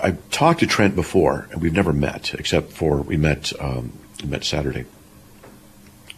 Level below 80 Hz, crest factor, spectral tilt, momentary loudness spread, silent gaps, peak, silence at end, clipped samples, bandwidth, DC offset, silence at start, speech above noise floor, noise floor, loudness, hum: -38 dBFS; 18 dB; -5.5 dB/octave; 12 LU; none; -4 dBFS; 0.65 s; under 0.1%; 14.5 kHz; under 0.1%; 0 s; 26 dB; -47 dBFS; -21 LUFS; none